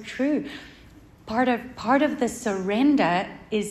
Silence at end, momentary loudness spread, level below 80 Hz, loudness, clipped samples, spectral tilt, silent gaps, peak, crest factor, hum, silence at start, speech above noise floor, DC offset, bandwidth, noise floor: 0 s; 9 LU; -56 dBFS; -24 LUFS; under 0.1%; -5 dB/octave; none; -8 dBFS; 16 dB; none; 0 s; 26 dB; under 0.1%; 13 kHz; -49 dBFS